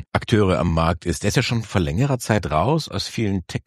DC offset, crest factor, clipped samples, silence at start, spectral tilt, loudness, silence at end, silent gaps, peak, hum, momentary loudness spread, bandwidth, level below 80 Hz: under 0.1%; 18 dB; under 0.1%; 0 s; -5.5 dB/octave; -21 LUFS; 0.05 s; none; -2 dBFS; none; 5 LU; 13.5 kHz; -36 dBFS